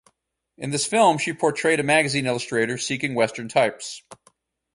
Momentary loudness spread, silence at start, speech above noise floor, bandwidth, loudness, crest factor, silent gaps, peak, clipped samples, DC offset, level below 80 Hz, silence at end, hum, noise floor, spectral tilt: 12 LU; 0.6 s; 46 dB; 11.5 kHz; -22 LUFS; 20 dB; none; -4 dBFS; under 0.1%; under 0.1%; -64 dBFS; 0.6 s; none; -68 dBFS; -3.5 dB/octave